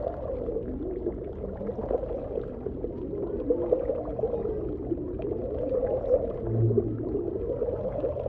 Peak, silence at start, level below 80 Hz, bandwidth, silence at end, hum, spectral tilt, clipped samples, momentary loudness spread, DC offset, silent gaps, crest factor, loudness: -10 dBFS; 0 s; -42 dBFS; 3.9 kHz; 0 s; none; -12.5 dB/octave; under 0.1%; 8 LU; under 0.1%; none; 20 dB; -30 LUFS